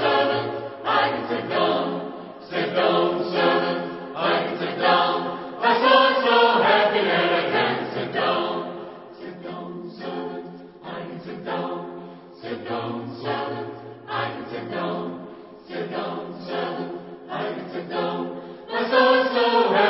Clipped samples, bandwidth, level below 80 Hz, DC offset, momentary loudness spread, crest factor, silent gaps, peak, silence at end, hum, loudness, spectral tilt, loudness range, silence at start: under 0.1%; 5.8 kHz; -70 dBFS; under 0.1%; 19 LU; 20 dB; none; -2 dBFS; 0 s; none; -23 LUFS; -9 dB/octave; 13 LU; 0 s